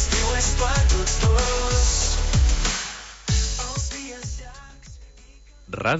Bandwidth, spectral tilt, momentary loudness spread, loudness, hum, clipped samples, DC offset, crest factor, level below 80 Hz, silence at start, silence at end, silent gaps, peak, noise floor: 8 kHz; -3.5 dB/octave; 14 LU; -22 LUFS; none; under 0.1%; under 0.1%; 14 dB; -24 dBFS; 0 s; 0 s; none; -8 dBFS; -47 dBFS